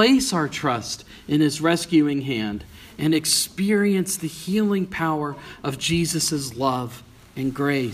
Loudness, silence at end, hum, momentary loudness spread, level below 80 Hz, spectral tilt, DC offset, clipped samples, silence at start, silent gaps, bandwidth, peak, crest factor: -22 LUFS; 0 s; none; 12 LU; -52 dBFS; -4 dB/octave; under 0.1%; under 0.1%; 0 s; none; 15.5 kHz; -4 dBFS; 18 dB